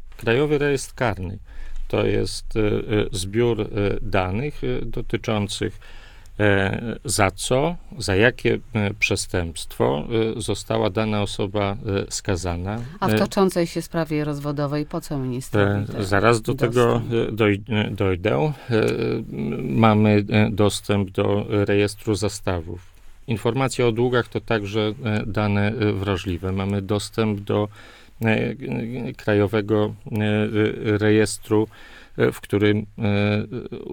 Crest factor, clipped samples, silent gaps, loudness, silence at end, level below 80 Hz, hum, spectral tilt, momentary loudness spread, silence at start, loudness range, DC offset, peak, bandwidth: 20 dB; under 0.1%; none; -22 LUFS; 0 s; -38 dBFS; none; -6 dB/octave; 9 LU; 0 s; 4 LU; under 0.1%; -2 dBFS; 18.5 kHz